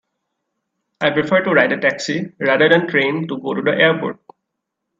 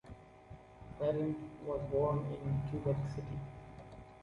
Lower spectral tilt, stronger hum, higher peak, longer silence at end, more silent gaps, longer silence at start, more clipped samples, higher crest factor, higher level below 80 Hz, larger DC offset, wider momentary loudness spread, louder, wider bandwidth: second, -5.5 dB/octave vs -9.5 dB/octave; neither; first, 0 dBFS vs -22 dBFS; first, 0.85 s vs 0 s; neither; first, 1 s vs 0.05 s; neither; about the same, 18 dB vs 16 dB; second, -64 dBFS vs -56 dBFS; neither; second, 10 LU vs 21 LU; first, -16 LUFS vs -38 LUFS; about the same, 7.6 kHz vs 7.2 kHz